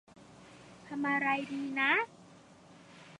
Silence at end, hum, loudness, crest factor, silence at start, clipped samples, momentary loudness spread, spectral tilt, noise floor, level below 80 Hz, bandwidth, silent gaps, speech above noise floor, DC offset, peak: 0.05 s; none; -32 LUFS; 20 dB; 0.2 s; under 0.1%; 25 LU; -4.5 dB/octave; -57 dBFS; -78 dBFS; 10.5 kHz; none; 25 dB; under 0.1%; -16 dBFS